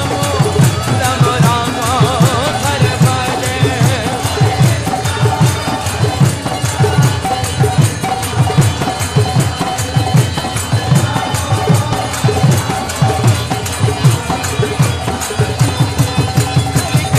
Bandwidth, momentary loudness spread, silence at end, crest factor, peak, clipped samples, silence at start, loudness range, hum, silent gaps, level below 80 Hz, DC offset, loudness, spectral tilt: 14.5 kHz; 5 LU; 0 s; 12 dB; 0 dBFS; under 0.1%; 0 s; 2 LU; none; none; -32 dBFS; 0.2%; -14 LUFS; -5 dB/octave